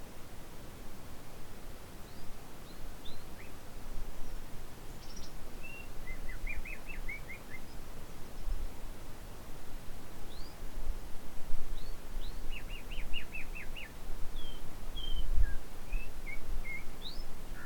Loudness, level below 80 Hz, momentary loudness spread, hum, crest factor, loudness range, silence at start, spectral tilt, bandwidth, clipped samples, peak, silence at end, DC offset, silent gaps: -46 LUFS; -38 dBFS; 8 LU; none; 18 dB; 7 LU; 0 s; -4 dB/octave; 18.5 kHz; under 0.1%; -14 dBFS; 0 s; under 0.1%; none